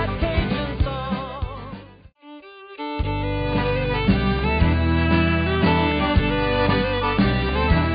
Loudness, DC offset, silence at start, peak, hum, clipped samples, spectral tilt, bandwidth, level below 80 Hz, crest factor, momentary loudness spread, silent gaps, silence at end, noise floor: -21 LUFS; under 0.1%; 0 s; -6 dBFS; none; under 0.1%; -11.5 dB/octave; 5.2 kHz; -28 dBFS; 14 dB; 13 LU; none; 0 s; -45 dBFS